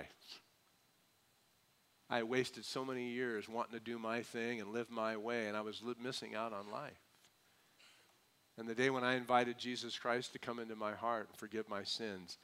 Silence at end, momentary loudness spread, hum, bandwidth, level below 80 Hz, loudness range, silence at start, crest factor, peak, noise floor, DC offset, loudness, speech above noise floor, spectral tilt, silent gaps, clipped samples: 0.1 s; 11 LU; none; 16 kHz; -86 dBFS; 6 LU; 0 s; 24 dB; -18 dBFS; -74 dBFS; under 0.1%; -41 LUFS; 33 dB; -4 dB/octave; none; under 0.1%